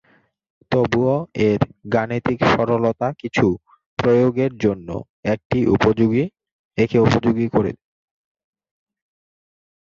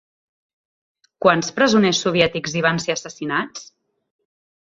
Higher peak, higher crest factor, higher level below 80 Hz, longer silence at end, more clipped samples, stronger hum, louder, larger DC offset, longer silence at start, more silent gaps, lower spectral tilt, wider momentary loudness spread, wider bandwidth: about the same, -2 dBFS vs -2 dBFS; about the same, 18 dB vs 20 dB; first, -46 dBFS vs -58 dBFS; first, 2.05 s vs 1.05 s; neither; neither; about the same, -19 LUFS vs -19 LUFS; neither; second, 0.7 s vs 1.2 s; first, 3.86-3.97 s, 5.09-5.23 s, 5.45-5.50 s, 6.52-6.71 s vs none; first, -7.5 dB/octave vs -4 dB/octave; about the same, 10 LU vs 10 LU; about the same, 7.6 kHz vs 7.8 kHz